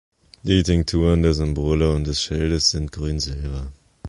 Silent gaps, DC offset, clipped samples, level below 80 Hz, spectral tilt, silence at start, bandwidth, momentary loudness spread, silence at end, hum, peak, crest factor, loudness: none; under 0.1%; under 0.1%; -28 dBFS; -5.5 dB/octave; 0.45 s; 11.5 kHz; 12 LU; 0 s; none; -4 dBFS; 18 dB; -21 LUFS